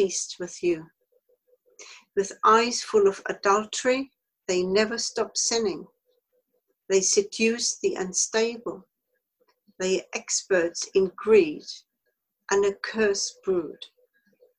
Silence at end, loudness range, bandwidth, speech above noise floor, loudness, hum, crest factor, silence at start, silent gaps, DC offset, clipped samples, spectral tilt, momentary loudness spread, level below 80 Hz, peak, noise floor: 0.75 s; 3 LU; 11.5 kHz; 54 dB; -25 LUFS; none; 20 dB; 0 s; none; under 0.1%; under 0.1%; -2.5 dB/octave; 17 LU; -66 dBFS; -6 dBFS; -78 dBFS